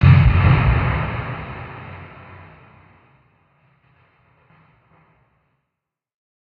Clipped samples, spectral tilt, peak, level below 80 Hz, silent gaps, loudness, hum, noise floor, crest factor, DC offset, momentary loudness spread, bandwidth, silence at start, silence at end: under 0.1%; -10 dB/octave; -2 dBFS; -30 dBFS; none; -17 LUFS; none; -81 dBFS; 20 dB; under 0.1%; 27 LU; 4.9 kHz; 0 s; 4.45 s